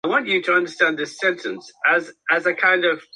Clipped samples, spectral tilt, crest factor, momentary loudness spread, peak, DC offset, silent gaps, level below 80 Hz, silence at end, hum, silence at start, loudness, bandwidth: under 0.1%; -3.5 dB/octave; 18 dB; 5 LU; -4 dBFS; under 0.1%; none; -72 dBFS; 0.15 s; none; 0.05 s; -19 LUFS; 11 kHz